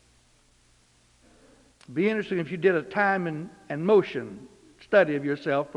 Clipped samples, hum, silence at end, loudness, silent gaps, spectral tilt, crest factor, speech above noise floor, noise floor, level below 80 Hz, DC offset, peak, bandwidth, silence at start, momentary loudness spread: under 0.1%; 60 Hz at -65 dBFS; 0.05 s; -25 LUFS; none; -7.5 dB/octave; 22 dB; 37 dB; -62 dBFS; -66 dBFS; under 0.1%; -6 dBFS; 10.5 kHz; 1.9 s; 14 LU